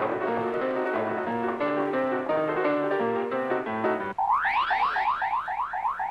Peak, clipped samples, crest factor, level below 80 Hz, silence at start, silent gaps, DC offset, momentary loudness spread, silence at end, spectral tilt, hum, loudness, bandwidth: -14 dBFS; under 0.1%; 12 dB; -62 dBFS; 0 s; none; under 0.1%; 4 LU; 0 s; -6.5 dB/octave; none; -27 LUFS; 10.5 kHz